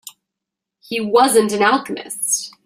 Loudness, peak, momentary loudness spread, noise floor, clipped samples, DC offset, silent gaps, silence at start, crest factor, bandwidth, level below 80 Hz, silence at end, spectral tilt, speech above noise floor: -17 LUFS; -2 dBFS; 12 LU; -83 dBFS; under 0.1%; under 0.1%; none; 0.05 s; 18 dB; 16 kHz; -64 dBFS; 0.15 s; -2.5 dB/octave; 66 dB